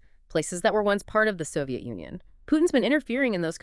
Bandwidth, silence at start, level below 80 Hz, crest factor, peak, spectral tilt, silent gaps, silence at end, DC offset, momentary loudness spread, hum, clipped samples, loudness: 12 kHz; 0.3 s; -52 dBFS; 18 dB; -8 dBFS; -4.5 dB/octave; none; 0.05 s; under 0.1%; 14 LU; none; under 0.1%; -25 LUFS